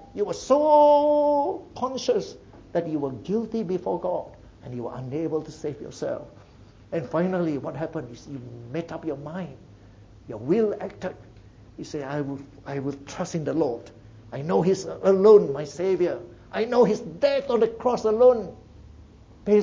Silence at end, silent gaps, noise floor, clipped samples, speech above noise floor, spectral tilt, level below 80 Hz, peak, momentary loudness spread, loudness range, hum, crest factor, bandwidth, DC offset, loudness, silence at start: 0 s; none; -50 dBFS; under 0.1%; 26 dB; -6.5 dB/octave; -56 dBFS; -4 dBFS; 18 LU; 10 LU; none; 20 dB; 7.8 kHz; under 0.1%; -24 LUFS; 0 s